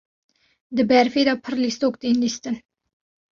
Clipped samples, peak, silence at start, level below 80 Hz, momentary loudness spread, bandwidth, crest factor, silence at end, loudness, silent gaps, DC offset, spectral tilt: under 0.1%; -4 dBFS; 0.7 s; -62 dBFS; 12 LU; 7.4 kHz; 18 dB; 0.75 s; -21 LUFS; none; under 0.1%; -4 dB/octave